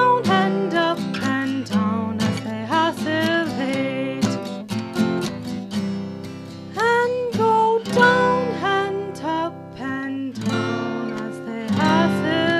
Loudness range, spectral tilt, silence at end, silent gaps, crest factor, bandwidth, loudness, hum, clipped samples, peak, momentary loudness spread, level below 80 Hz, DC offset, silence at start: 5 LU; -5.5 dB/octave; 0 s; none; 20 dB; 14 kHz; -21 LUFS; none; under 0.1%; -2 dBFS; 11 LU; -62 dBFS; under 0.1%; 0 s